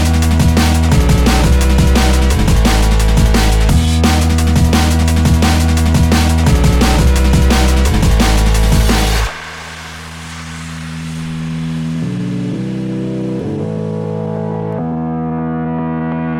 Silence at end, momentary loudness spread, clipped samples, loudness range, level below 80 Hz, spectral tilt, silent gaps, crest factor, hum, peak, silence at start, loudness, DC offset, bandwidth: 0 s; 12 LU; under 0.1%; 9 LU; -16 dBFS; -5.5 dB/octave; none; 12 dB; none; 0 dBFS; 0 s; -13 LUFS; under 0.1%; 18 kHz